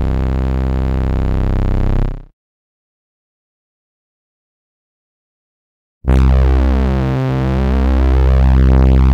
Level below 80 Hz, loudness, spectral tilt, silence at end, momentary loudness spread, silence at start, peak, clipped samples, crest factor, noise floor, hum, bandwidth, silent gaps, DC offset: -16 dBFS; -15 LUFS; -9 dB/octave; 0 s; 7 LU; 0 s; -4 dBFS; under 0.1%; 10 dB; under -90 dBFS; none; 5.2 kHz; 2.33-6.01 s; under 0.1%